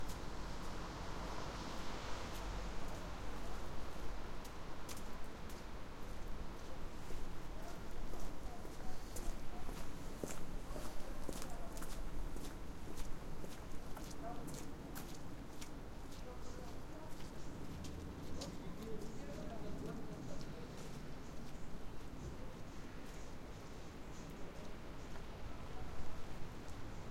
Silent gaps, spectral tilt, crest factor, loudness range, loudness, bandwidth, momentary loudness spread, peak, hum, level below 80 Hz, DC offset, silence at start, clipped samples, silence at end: none; -5 dB/octave; 16 dB; 4 LU; -50 LUFS; 16 kHz; 5 LU; -26 dBFS; none; -50 dBFS; under 0.1%; 0 s; under 0.1%; 0 s